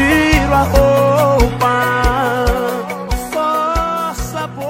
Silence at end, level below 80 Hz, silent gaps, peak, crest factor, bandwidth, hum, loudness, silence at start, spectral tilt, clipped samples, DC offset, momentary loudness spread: 0 s; -22 dBFS; none; 0 dBFS; 14 dB; 16.5 kHz; none; -14 LUFS; 0 s; -5.5 dB/octave; under 0.1%; under 0.1%; 10 LU